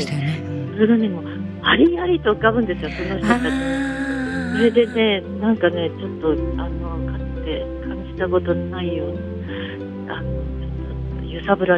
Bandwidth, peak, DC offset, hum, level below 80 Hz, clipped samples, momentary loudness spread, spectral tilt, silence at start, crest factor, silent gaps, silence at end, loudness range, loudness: 10.5 kHz; -2 dBFS; under 0.1%; none; -34 dBFS; under 0.1%; 12 LU; -7 dB/octave; 0 s; 20 dB; none; 0 s; 6 LU; -21 LUFS